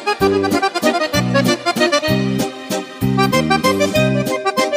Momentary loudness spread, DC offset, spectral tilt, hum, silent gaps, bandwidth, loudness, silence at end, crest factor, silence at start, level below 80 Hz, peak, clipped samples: 6 LU; under 0.1%; -5 dB/octave; none; none; 16 kHz; -16 LUFS; 0 s; 16 dB; 0 s; -42 dBFS; -2 dBFS; under 0.1%